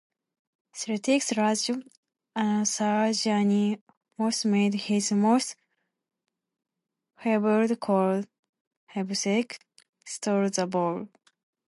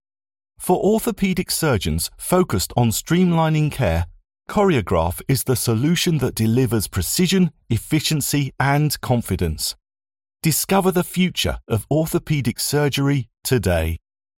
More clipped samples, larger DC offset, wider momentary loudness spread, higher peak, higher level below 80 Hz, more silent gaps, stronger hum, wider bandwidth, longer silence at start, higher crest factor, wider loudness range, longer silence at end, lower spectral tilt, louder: neither; neither; first, 13 LU vs 6 LU; second, -10 dBFS vs -4 dBFS; second, -78 dBFS vs -38 dBFS; first, 1.97-2.03 s, 3.81-3.87 s, 3.97-4.01 s, 8.39-8.43 s, 8.49-8.53 s, 8.61-8.71 s, 8.77-8.87 s, 9.89-9.93 s vs none; neither; second, 11.5 kHz vs 17 kHz; first, 0.75 s vs 0.6 s; about the same, 16 dB vs 16 dB; about the same, 4 LU vs 2 LU; first, 0.6 s vs 0.4 s; about the same, -4.5 dB/octave vs -5 dB/octave; second, -26 LUFS vs -20 LUFS